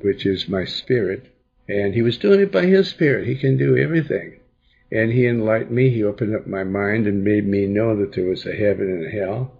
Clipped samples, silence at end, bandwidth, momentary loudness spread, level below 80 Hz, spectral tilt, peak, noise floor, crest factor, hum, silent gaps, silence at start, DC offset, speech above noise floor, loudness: under 0.1%; 0.1 s; 7.2 kHz; 9 LU; -52 dBFS; -8.5 dB/octave; -4 dBFS; -58 dBFS; 16 dB; none; none; 0.05 s; under 0.1%; 39 dB; -19 LUFS